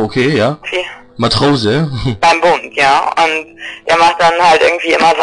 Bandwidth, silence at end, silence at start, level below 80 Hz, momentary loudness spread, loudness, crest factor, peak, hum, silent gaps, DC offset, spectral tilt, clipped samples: 10.5 kHz; 0 s; 0 s; -40 dBFS; 10 LU; -11 LUFS; 10 dB; -2 dBFS; none; none; under 0.1%; -4.5 dB/octave; under 0.1%